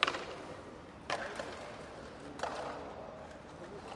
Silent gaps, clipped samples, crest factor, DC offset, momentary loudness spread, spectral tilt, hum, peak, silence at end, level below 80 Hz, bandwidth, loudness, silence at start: none; under 0.1%; 34 dB; under 0.1%; 10 LU; -3.5 dB/octave; none; -8 dBFS; 0 s; -64 dBFS; 11.5 kHz; -43 LUFS; 0 s